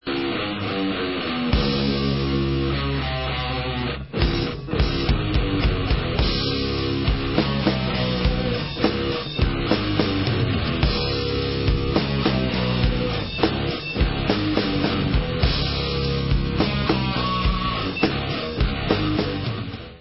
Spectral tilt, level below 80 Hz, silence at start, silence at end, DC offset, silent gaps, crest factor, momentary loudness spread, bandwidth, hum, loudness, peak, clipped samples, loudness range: -10 dB/octave; -28 dBFS; 0.05 s; 0 s; 0.2%; none; 20 dB; 4 LU; 5.8 kHz; none; -23 LUFS; -2 dBFS; under 0.1%; 1 LU